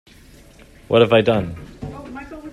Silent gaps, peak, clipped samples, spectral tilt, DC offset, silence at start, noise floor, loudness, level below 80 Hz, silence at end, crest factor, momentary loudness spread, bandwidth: none; -2 dBFS; under 0.1%; -7 dB/octave; under 0.1%; 0.9 s; -46 dBFS; -16 LUFS; -46 dBFS; 0 s; 20 dB; 20 LU; 12.5 kHz